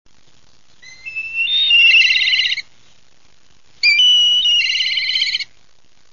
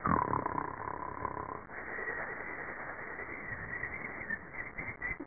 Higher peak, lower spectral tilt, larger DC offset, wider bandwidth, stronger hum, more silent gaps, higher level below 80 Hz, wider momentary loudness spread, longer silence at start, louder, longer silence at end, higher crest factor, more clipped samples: first, -4 dBFS vs -16 dBFS; second, 3.5 dB/octave vs -9.5 dB/octave; first, 0.7% vs 0.2%; first, 7.4 kHz vs 2.6 kHz; neither; neither; about the same, -60 dBFS vs -56 dBFS; first, 16 LU vs 7 LU; first, 0.85 s vs 0 s; first, -12 LUFS vs -39 LUFS; first, 0.7 s vs 0 s; second, 14 dB vs 22 dB; neither